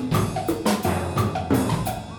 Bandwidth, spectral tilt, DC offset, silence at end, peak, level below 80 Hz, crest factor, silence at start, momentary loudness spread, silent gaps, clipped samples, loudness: over 20 kHz; -6 dB/octave; under 0.1%; 0 s; -8 dBFS; -42 dBFS; 14 dB; 0 s; 3 LU; none; under 0.1%; -24 LUFS